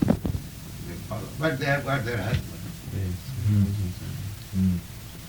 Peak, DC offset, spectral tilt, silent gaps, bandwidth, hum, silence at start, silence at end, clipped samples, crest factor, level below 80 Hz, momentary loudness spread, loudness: -6 dBFS; under 0.1%; -6.5 dB/octave; none; over 20 kHz; none; 0 s; 0 s; under 0.1%; 22 dB; -42 dBFS; 13 LU; -28 LUFS